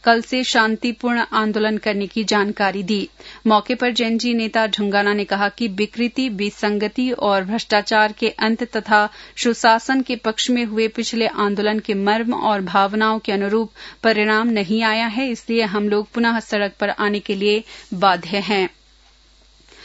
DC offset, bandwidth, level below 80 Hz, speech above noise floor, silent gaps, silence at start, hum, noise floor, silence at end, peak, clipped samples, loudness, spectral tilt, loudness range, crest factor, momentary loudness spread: under 0.1%; 8 kHz; -54 dBFS; 33 dB; none; 0.05 s; none; -52 dBFS; 0 s; 0 dBFS; under 0.1%; -19 LUFS; -4.5 dB/octave; 2 LU; 18 dB; 5 LU